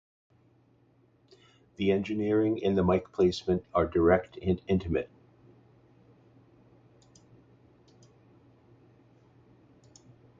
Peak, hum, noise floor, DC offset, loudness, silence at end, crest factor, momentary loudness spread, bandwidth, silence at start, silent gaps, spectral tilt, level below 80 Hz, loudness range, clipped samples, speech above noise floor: -10 dBFS; none; -65 dBFS; under 0.1%; -28 LUFS; 5.35 s; 22 dB; 7 LU; 7.6 kHz; 1.8 s; none; -7.5 dB/octave; -50 dBFS; 9 LU; under 0.1%; 38 dB